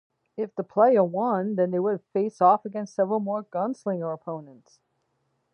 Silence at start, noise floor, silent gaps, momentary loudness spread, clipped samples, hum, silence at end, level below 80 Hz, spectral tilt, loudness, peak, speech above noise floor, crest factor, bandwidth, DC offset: 0.4 s; -74 dBFS; none; 14 LU; under 0.1%; none; 1 s; -80 dBFS; -8.5 dB/octave; -25 LUFS; -8 dBFS; 49 dB; 18 dB; 9.8 kHz; under 0.1%